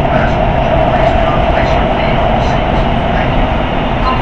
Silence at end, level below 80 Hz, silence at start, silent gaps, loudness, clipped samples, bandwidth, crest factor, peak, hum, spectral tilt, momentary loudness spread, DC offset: 0 s; -18 dBFS; 0 s; none; -12 LUFS; under 0.1%; 7.6 kHz; 12 dB; 0 dBFS; none; -7.5 dB/octave; 3 LU; 2%